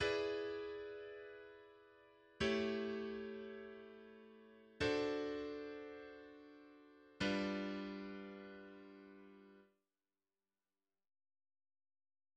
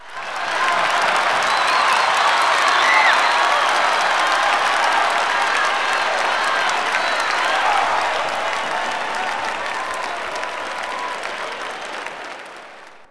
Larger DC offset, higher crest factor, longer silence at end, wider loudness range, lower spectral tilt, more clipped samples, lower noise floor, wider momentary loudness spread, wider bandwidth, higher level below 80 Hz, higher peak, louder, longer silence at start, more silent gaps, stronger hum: neither; about the same, 20 dB vs 16 dB; first, 2.7 s vs 0 s; first, 12 LU vs 9 LU; first, -5 dB/octave vs 0 dB/octave; neither; first, under -90 dBFS vs -41 dBFS; first, 23 LU vs 12 LU; second, 9.8 kHz vs 11 kHz; second, -70 dBFS vs -60 dBFS; second, -26 dBFS vs -4 dBFS; second, -44 LUFS vs -18 LUFS; about the same, 0 s vs 0 s; neither; neither